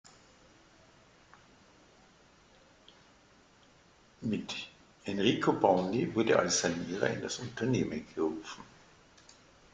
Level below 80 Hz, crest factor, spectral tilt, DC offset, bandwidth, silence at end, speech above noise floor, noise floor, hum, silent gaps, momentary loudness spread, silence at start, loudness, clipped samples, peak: -66 dBFS; 24 dB; -4.5 dB/octave; under 0.1%; 9.6 kHz; 1.1 s; 31 dB; -62 dBFS; none; none; 15 LU; 4.2 s; -31 LUFS; under 0.1%; -10 dBFS